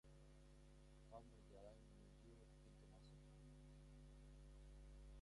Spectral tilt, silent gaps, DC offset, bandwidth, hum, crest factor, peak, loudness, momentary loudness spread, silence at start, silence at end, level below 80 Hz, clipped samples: -6 dB/octave; none; under 0.1%; 11 kHz; none; 18 dB; -46 dBFS; -66 LUFS; 5 LU; 0.05 s; 0 s; -66 dBFS; under 0.1%